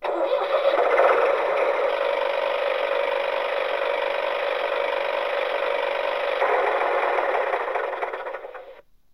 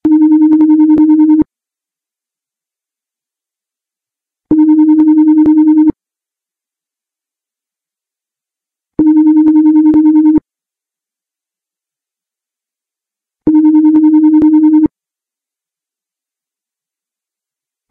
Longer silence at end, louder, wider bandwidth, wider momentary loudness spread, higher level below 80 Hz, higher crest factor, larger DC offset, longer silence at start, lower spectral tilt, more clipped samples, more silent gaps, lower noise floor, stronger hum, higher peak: second, 0.35 s vs 3.05 s; second, -23 LUFS vs -8 LUFS; first, 11.5 kHz vs 2.3 kHz; about the same, 7 LU vs 6 LU; second, -64 dBFS vs -48 dBFS; first, 18 dB vs 10 dB; first, 0.2% vs under 0.1%; about the same, 0 s vs 0.05 s; second, -2.5 dB/octave vs -11 dB/octave; neither; neither; second, -48 dBFS vs -86 dBFS; neither; second, -4 dBFS vs 0 dBFS